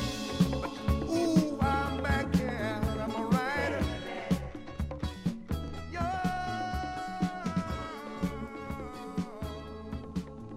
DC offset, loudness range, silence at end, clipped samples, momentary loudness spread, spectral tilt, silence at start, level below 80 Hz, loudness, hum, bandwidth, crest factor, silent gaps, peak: under 0.1%; 7 LU; 0 s; under 0.1%; 11 LU; -6.5 dB/octave; 0 s; -42 dBFS; -33 LUFS; none; 16 kHz; 20 dB; none; -12 dBFS